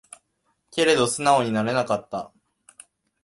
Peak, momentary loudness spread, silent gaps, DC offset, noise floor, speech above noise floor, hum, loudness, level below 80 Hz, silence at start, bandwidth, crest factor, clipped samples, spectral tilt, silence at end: -4 dBFS; 14 LU; none; under 0.1%; -72 dBFS; 50 dB; none; -22 LUFS; -62 dBFS; 0.75 s; 11.5 kHz; 22 dB; under 0.1%; -4 dB/octave; 0.95 s